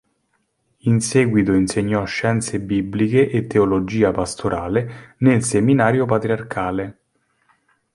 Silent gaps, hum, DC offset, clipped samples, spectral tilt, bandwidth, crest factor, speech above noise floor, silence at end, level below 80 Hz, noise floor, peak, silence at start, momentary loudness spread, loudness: none; none; under 0.1%; under 0.1%; -6 dB/octave; 11.5 kHz; 18 dB; 50 dB; 1.05 s; -46 dBFS; -68 dBFS; -2 dBFS; 0.85 s; 7 LU; -19 LUFS